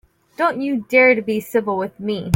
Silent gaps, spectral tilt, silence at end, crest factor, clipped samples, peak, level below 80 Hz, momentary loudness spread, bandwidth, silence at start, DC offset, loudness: none; -6 dB/octave; 0 s; 16 dB; under 0.1%; -2 dBFS; -60 dBFS; 11 LU; 16.5 kHz; 0.4 s; under 0.1%; -18 LUFS